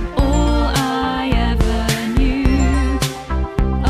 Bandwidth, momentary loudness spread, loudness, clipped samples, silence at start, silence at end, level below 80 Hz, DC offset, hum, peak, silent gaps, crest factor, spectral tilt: 15 kHz; 4 LU; -18 LUFS; under 0.1%; 0 s; 0 s; -18 dBFS; under 0.1%; none; -2 dBFS; none; 14 dB; -5.5 dB/octave